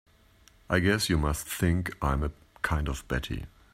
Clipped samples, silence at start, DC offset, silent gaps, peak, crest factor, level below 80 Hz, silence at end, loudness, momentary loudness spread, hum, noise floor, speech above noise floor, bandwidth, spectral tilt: under 0.1%; 0.7 s; under 0.1%; none; -10 dBFS; 20 dB; -38 dBFS; 0.25 s; -29 LUFS; 9 LU; none; -59 dBFS; 31 dB; 16 kHz; -5 dB/octave